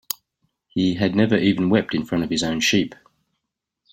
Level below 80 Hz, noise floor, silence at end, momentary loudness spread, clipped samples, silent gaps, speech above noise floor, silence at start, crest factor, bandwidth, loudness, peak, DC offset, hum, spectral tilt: -56 dBFS; -80 dBFS; 1 s; 12 LU; under 0.1%; none; 60 dB; 0.75 s; 20 dB; 16.5 kHz; -21 LUFS; -2 dBFS; under 0.1%; none; -5 dB/octave